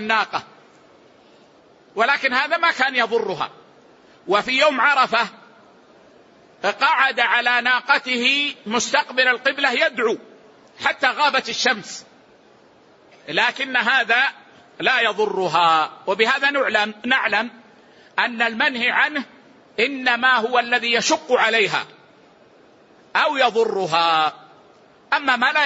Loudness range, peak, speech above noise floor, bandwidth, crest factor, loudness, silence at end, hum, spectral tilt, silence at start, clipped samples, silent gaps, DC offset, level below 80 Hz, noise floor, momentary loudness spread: 3 LU; -2 dBFS; 32 dB; 8 kHz; 18 dB; -19 LUFS; 0 s; none; -2 dB/octave; 0 s; under 0.1%; none; under 0.1%; -72 dBFS; -52 dBFS; 9 LU